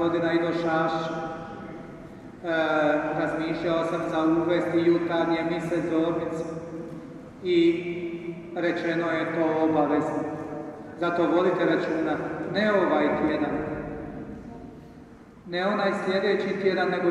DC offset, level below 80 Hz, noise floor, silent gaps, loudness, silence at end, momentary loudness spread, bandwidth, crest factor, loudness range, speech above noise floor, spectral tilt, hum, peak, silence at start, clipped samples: under 0.1%; -56 dBFS; -47 dBFS; none; -26 LUFS; 0 s; 16 LU; 8.6 kHz; 16 dB; 3 LU; 23 dB; -7 dB/octave; none; -10 dBFS; 0 s; under 0.1%